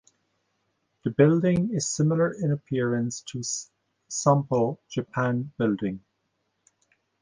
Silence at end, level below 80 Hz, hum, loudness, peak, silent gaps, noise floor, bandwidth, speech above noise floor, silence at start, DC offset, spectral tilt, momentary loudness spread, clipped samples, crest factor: 1.25 s; -62 dBFS; none; -26 LUFS; -6 dBFS; none; -76 dBFS; 10 kHz; 51 dB; 1.05 s; under 0.1%; -6 dB/octave; 12 LU; under 0.1%; 20 dB